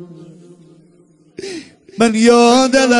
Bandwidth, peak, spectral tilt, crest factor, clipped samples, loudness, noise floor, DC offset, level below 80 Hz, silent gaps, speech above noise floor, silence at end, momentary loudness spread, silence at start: 11 kHz; 0 dBFS; -3.5 dB/octave; 14 dB; under 0.1%; -11 LUFS; -50 dBFS; under 0.1%; -54 dBFS; none; 40 dB; 0 s; 22 LU; 0 s